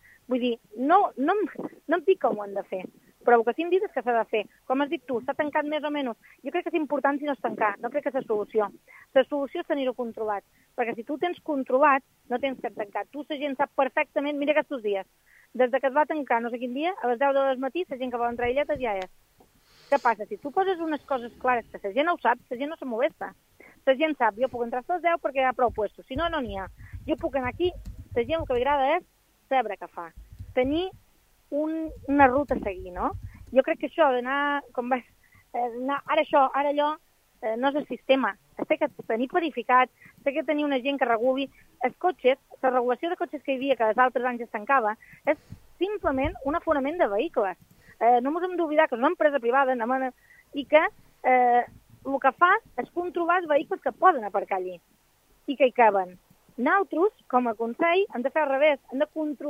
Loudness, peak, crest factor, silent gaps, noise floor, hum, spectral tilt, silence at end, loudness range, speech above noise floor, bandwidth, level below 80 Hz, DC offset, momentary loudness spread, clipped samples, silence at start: -26 LUFS; -4 dBFS; 24 dB; none; -63 dBFS; none; -6 dB/octave; 0 s; 4 LU; 38 dB; 15.5 kHz; -54 dBFS; under 0.1%; 11 LU; under 0.1%; 0.3 s